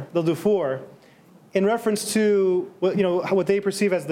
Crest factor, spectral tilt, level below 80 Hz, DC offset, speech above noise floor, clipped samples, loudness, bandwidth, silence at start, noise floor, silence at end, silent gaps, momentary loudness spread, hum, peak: 14 dB; -5.5 dB/octave; -68 dBFS; under 0.1%; 30 dB; under 0.1%; -22 LUFS; 16 kHz; 0 s; -52 dBFS; 0 s; none; 5 LU; none; -8 dBFS